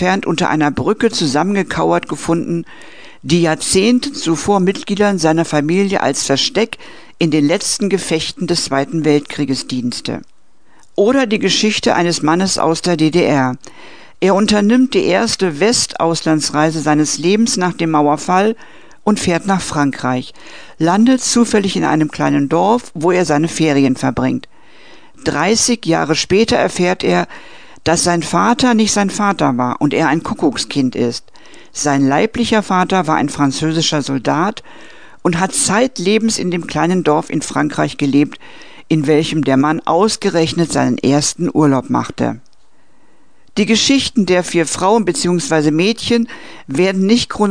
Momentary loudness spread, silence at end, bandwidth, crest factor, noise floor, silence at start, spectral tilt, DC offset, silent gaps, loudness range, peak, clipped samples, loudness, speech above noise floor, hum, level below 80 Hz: 7 LU; 0 s; 10 kHz; 14 dB; -56 dBFS; 0 s; -4.5 dB/octave; 1%; none; 2 LU; 0 dBFS; under 0.1%; -15 LUFS; 41 dB; none; -46 dBFS